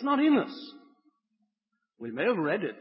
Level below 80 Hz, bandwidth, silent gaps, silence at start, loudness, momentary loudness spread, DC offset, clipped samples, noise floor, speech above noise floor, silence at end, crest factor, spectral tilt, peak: -84 dBFS; 5.8 kHz; none; 0 s; -27 LUFS; 20 LU; under 0.1%; under 0.1%; -83 dBFS; 55 dB; 0 s; 16 dB; -9.5 dB/octave; -14 dBFS